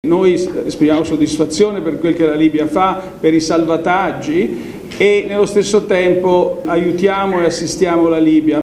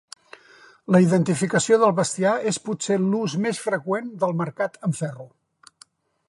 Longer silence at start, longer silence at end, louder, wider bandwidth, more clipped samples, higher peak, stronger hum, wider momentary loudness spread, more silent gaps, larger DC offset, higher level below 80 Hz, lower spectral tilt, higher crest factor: second, 0.05 s vs 0.9 s; second, 0 s vs 1 s; first, -14 LUFS vs -22 LUFS; about the same, 12.5 kHz vs 11.5 kHz; neither; first, 0 dBFS vs -4 dBFS; neither; second, 5 LU vs 10 LU; neither; neither; first, -44 dBFS vs -70 dBFS; about the same, -5.5 dB/octave vs -5.5 dB/octave; second, 14 dB vs 20 dB